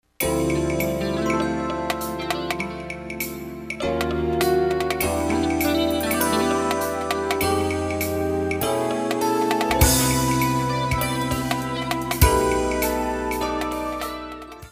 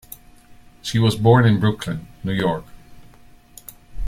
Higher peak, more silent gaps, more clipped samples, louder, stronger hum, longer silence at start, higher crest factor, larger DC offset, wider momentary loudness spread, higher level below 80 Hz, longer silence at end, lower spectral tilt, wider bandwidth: about the same, -2 dBFS vs -2 dBFS; neither; neither; second, -23 LUFS vs -19 LUFS; neither; second, 0.2 s vs 0.85 s; about the same, 22 dB vs 20 dB; neither; second, 9 LU vs 26 LU; first, -36 dBFS vs -42 dBFS; about the same, 0 s vs 0 s; second, -4.5 dB/octave vs -6.5 dB/octave; about the same, 16 kHz vs 15.5 kHz